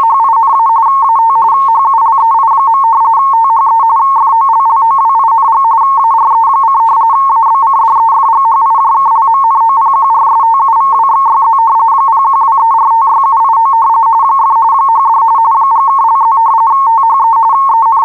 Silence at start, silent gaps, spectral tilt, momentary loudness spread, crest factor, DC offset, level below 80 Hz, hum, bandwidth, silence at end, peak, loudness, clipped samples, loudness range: 0 s; none; -4 dB/octave; 0 LU; 4 dB; 0.4%; -70 dBFS; none; 4.1 kHz; 0 s; -2 dBFS; -7 LUFS; under 0.1%; 0 LU